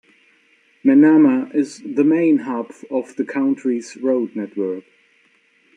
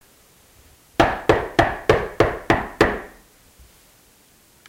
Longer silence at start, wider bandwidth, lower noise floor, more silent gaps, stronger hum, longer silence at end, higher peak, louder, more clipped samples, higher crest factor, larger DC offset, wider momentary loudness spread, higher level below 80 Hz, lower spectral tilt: second, 0.85 s vs 1 s; second, 9.8 kHz vs 16.5 kHz; first, -58 dBFS vs -54 dBFS; neither; neither; second, 0.95 s vs 1.6 s; about the same, -4 dBFS vs -4 dBFS; about the same, -18 LUFS vs -20 LUFS; neither; about the same, 16 dB vs 18 dB; neither; first, 14 LU vs 8 LU; second, -72 dBFS vs -38 dBFS; first, -7 dB/octave vs -5.5 dB/octave